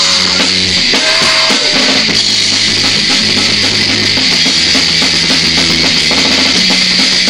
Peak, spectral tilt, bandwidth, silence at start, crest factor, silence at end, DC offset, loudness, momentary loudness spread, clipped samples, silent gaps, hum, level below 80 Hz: 0 dBFS; -1.5 dB/octave; over 20 kHz; 0 s; 10 dB; 0 s; 0.9%; -7 LUFS; 1 LU; 0.2%; none; none; -38 dBFS